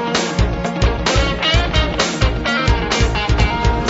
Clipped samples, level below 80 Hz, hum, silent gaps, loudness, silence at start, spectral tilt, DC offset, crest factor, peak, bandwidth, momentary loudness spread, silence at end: under 0.1%; -20 dBFS; none; none; -17 LUFS; 0 s; -4.5 dB/octave; under 0.1%; 14 dB; -2 dBFS; 8 kHz; 3 LU; 0 s